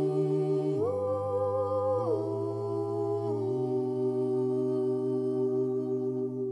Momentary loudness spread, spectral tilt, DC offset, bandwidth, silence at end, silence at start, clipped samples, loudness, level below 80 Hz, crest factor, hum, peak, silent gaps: 4 LU; -10 dB/octave; under 0.1%; 8.8 kHz; 0 s; 0 s; under 0.1%; -30 LUFS; -80 dBFS; 10 dB; none; -18 dBFS; none